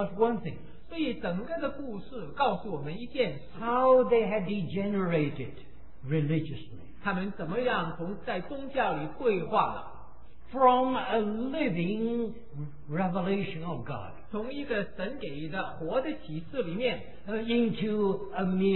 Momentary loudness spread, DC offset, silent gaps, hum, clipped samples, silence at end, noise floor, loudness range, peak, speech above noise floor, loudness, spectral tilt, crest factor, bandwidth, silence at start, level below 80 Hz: 14 LU; 1%; none; none; under 0.1%; 0 s; -51 dBFS; 6 LU; -10 dBFS; 21 dB; -30 LUFS; -10.5 dB/octave; 20 dB; 4.2 kHz; 0 s; -54 dBFS